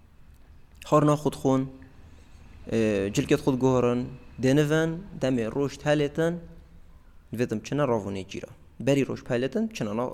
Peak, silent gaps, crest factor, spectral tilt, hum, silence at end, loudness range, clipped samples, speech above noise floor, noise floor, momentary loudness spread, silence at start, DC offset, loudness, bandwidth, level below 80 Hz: -8 dBFS; none; 18 dB; -6.5 dB/octave; none; 0 s; 4 LU; under 0.1%; 26 dB; -51 dBFS; 14 LU; 0.6 s; under 0.1%; -26 LUFS; 15 kHz; -50 dBFS